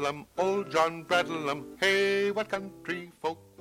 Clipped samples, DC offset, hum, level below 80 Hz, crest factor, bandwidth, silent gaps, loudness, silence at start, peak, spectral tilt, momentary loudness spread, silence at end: under 0.1%; under 0.1%; none; -66 dBFS; 20 dB; 16 kHz; none; -29 LUFS; 0 s; -10 dBFS; -4 dB/octave; 11 LU; 0.2 s